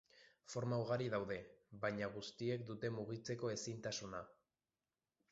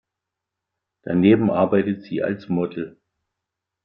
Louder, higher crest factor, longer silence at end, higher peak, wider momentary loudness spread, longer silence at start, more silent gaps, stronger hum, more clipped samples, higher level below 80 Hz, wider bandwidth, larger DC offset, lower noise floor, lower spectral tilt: second, -44 LUFS vs -20 LUFS; about the same, 18 dB vs 20 dB; about the same, 1 s vs 0.95 s; second, -26 dBFS vs -4 dBFS; second, 10 LU vs 16 LU; second, 0.15 s vs 1.05 s; neither; neither; neither; second, -76 dBFS vs -62 dBFS; first, 7.6 kHz vs 5.4 kHz; neither; first, under -90 dBFS vs -84 dBFS; second, -5 dB/octave vs -10.5 dB/octave